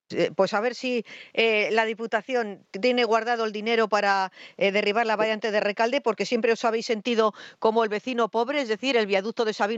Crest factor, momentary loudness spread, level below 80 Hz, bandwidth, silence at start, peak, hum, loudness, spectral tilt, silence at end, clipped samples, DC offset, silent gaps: 18 dB; 5 LU; -80 dBFS; 8 kHz; 0.1 s; -8 dBFS; none; -24 LUFS; -4 dB/octave; 0 s; under 0.1%; under 0.1%; none